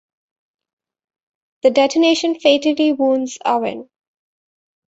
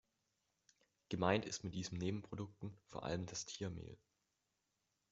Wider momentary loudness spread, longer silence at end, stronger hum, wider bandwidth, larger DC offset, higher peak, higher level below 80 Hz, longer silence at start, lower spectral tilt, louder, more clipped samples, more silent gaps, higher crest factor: second, 6 LU vs 16 LU; about the same, 1.1 s vs 1.15 s; neither; about the same, 8 kHz vs 8 kHz; neither; first, -2 dBFS vs -18 dBFS; about the same, -66 dBFS vs -70 dBFS; first, 1.65 s vs 1.1 s; second, -3 dB/octave vs -5 dB/octave; first, -16 LUFS vs -44 LUFS; neither; neither; second, 18 dB vs 28 dB